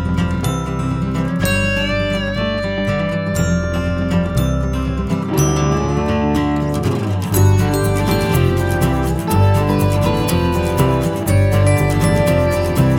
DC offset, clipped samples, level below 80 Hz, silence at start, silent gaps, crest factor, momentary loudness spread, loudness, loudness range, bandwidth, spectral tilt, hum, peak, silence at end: under 0.1%; under 0.1%; -28 dBFS; 0 s; none; 14 dB; 5 LU; -17 LUFS; 3 LU; 17 kHz; -6 dB/octave; none; 0 dBFS; 0 s